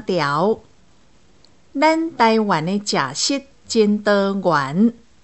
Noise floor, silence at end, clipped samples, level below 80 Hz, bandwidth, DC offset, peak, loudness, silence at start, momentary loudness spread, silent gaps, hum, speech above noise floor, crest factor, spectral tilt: -55 dBFS; 0.3 s; under 0.1%; -60 dBFS; 8.4 kHz; 0.3%; -2 dBFS; -18 LUFS; 0 s; 5 LU; none; none; 37 dB; 16 dB; -4.5 dB/octave